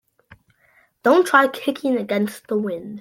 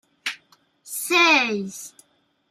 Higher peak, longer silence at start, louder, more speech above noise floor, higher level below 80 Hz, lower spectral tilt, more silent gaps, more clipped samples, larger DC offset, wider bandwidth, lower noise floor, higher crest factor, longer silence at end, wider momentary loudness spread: first, -2 dBFS vs -6 dBFS; first, 1.05 s vs 0.25 s; about the same, -20 LUFS vs -20 LUFS; about the same, 40 dB vs 43 dB; first, -66 dBFS vs -78 dBFS; first, -5 dB/octave vs -2 dB/octave; neither; neither; neither; about the same, 16.5 kHz vs 15.5 kHz; second, -59 dBFS vs -64 dBFS; about the same, 20 dB vs 18 dB; second, 0 s vs 0.6 s; second, 10 LU vs 24 LU